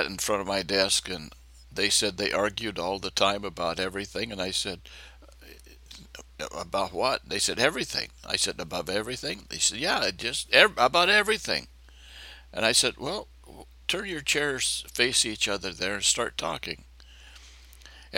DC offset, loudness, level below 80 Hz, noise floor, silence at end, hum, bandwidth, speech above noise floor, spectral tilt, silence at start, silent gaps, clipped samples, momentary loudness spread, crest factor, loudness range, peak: under 0.1%; -26 LUFS; -52 dBFS; -50 dBFS; 0 s; none; 17 kHz; 22 dB; -1.5 dB/octave; 0 s; none; under 0.1%; 15 LU; 28 dB; 7 LU; 0 dBFS